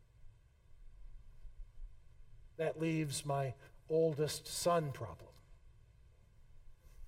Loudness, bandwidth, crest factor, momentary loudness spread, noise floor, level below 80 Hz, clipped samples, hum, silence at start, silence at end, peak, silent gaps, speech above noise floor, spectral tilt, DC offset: -37 LUFS; 16 kHz; 20 dB; 26 LU; -63 dBFS; -58 dBFS; under 0.1%; none; 0.2 s; 0 s; -22 dBFS; none; 27 dB; -5 dB/octave; under 0.1%